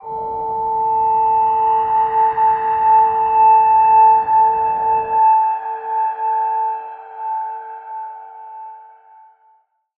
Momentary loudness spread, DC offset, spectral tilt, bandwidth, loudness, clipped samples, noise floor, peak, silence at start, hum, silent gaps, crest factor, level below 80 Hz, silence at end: 19 LU; under 0.1%; -7.5 dB/octave; 3.1 kHz; -15 LUFS; under 0.1%; -57 dBFS; -4 dBFS; 0.05 s; none; none; 12 dB; -54 dBFS; 1.15 s